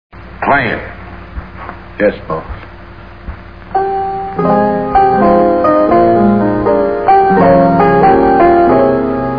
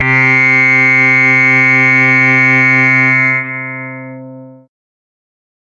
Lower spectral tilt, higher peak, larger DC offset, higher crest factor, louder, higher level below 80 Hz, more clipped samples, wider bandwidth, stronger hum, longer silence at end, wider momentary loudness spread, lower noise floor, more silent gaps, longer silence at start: first, -10 dB/octave vs -6 dB/octave; about the same, 0 dBFS vs -2 dBFS; first, 0.9% vs under 0.1%; about the same, 10 dB vs 10 dB; second, -10 LUFS vs -7 LUFS; first, -32 dBFS vs -62 dBFS; neither; second, 5.2 kHz vs 7.4 kHz; neither; second, 0 s vs 1.2 s; first, 21 LU vs 14 LU; about the same, -32 dBFS vs -32 dBFS; neither; first, 0.15 s vs 0 s